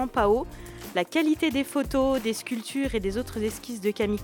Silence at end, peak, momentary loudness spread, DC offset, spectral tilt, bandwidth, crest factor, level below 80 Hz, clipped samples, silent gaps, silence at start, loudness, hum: 0 s; -10 dBFS; 8 LU; under 0.1%; -5 dB/octave; 18 kHz; 18 dB; -44 dBFS; under 0.1%; none; 0 s; -27 LUFS; none